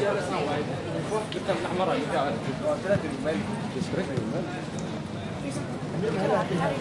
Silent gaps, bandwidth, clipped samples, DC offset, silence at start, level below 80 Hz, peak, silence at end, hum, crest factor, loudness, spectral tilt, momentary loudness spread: none; 11.5 kHz; under 0.1%; under 0.1%; 0 s; -56 dBFS; -12 dBFS; 0 s; none; 16 dB; -29 LUFS; -6 dB/octave; 7 LU